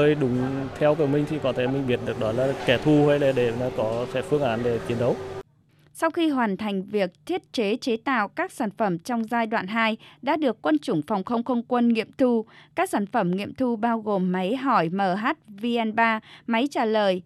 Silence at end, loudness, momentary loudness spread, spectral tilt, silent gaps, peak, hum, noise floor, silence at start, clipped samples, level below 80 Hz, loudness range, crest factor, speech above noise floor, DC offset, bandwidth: 0.05 s; -24 LUFS; 6 LU; -6.5 dB/octave; none; -6 dBFS; none; -59 dBFS; 0 s; under 0.1%; -58 dBFS; 3 LU; 18 dB; 35 dB; under 0.1%; 13.5 kHz